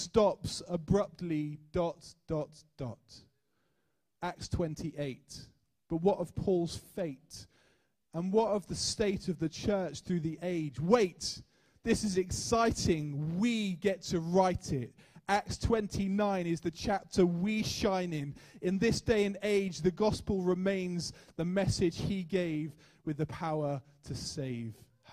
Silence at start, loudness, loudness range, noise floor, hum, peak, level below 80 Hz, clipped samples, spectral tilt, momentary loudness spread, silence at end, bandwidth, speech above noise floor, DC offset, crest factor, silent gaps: 0 s; -33 LUFS; 6 LU; -81 dBFS; none; -10 dBFS; -52 dBFS; under 0.1%; -5.5 dB/octave; 13 LU; 0 s; 15 kHz; 48 dB; under 0.1%; 22 dB; none